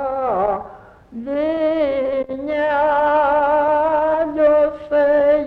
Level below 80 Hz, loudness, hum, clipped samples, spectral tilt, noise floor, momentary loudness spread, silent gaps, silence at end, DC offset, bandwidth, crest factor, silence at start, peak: -48 dBFS; -18 LUFS; none; under 0.1%; -7 dB/octave; -40 dBFS; 9 LU; none; 0 s; under 0.1%; 4.9 kHz; 12 dB; 0 s; -6 dBFS